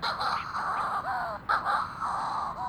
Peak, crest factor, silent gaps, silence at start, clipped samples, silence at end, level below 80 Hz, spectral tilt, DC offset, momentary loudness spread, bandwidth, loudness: -12 dBFS; 18 dB; none; 0 s; under 0.1%; 0 s; -56 dBFS; -3.5 dB/octave; under 0.1%; 5 LU; over 20 kHz; -30 LUFS